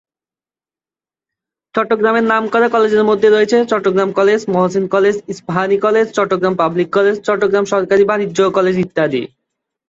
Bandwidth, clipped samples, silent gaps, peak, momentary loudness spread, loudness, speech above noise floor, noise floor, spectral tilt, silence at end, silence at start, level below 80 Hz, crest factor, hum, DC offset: 7.8 kHz; under 0.1%; none; -2 dBFS; 5 LU; -14 LUFS; over 77 dB; under -90 dBFS; -6 dB/octave; 0.65 s; 1.75 s; -58 dBFS; 14 dB; none; under 0.1%